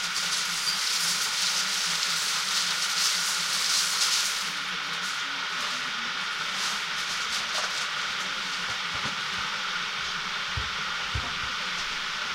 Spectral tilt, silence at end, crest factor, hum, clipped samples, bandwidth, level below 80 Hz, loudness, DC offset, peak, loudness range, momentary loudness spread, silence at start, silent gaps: 0.5 dB/octave; 0 s; 20 dB; none; under 0.1%; 16 kHz; -52 dBFS; -26 LUFS; under 0.1%; -8 dBFS; 5 LU; 6 LU; 0 s; none